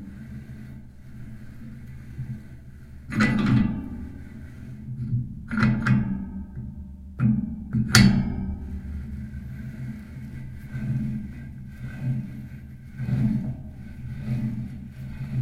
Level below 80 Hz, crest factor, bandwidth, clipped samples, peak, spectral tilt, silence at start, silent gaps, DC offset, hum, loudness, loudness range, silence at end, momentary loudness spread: -40 dBFS; 28 dB; 15.5 kHz; under 0.1%; 0 dBFS; -5.5 dB/octave; 0 s; none; under 0.1%; none; -26 LUFS; 10 LU; 0 s; 20 LU